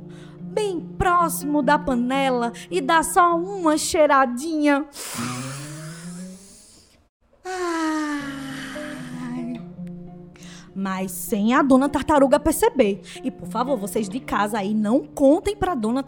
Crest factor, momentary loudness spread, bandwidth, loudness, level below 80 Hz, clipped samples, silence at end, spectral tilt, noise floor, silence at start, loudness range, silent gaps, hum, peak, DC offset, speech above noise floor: 20 dB; 18 LU; over 20 kHz; -21 LUFS; -46 dBFS; under 0.1%; 0 s; -4.5 dB/octave; -52 dBFS; 0 s; 10 LU; 7.09-7.20 s; none; -4 dBFS; under 0.1%; 31 dB